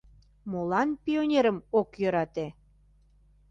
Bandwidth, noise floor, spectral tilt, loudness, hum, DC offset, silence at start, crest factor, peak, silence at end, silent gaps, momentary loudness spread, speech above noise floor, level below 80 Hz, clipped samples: 7.6 kHz; -61 dBFS; -7 dB/octave; -28 LUFS; 50 Hz at -60 dBFS; under 0.1%; 0.45 s; 18 dB; -12 dBFS; 1 s; none; 12 LU; 34 dB; -60 dBFS; under 0.1%